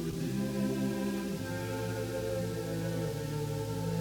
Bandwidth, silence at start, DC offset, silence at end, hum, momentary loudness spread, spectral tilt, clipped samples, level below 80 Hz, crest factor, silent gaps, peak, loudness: 20 kHz; 0 s; under 0.1%; 0 s; none; 3 LU; -6 dB/octave; under 0.1%; -54 dBFS; 12 dB; none; -22 dBFS; -35 LUFS